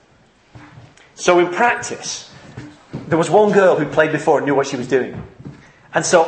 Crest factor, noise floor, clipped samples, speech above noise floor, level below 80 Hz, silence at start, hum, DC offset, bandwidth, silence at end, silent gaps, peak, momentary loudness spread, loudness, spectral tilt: 18 dB; -53 dBFS; under 0.1%; 37 dB; -56 dBFS; 0.55 s; none; under 0.1%; 8.8 kHz; 0 s; none; 0 dBFS; 22 LU; -16 LUFS; -4.5 dB/octave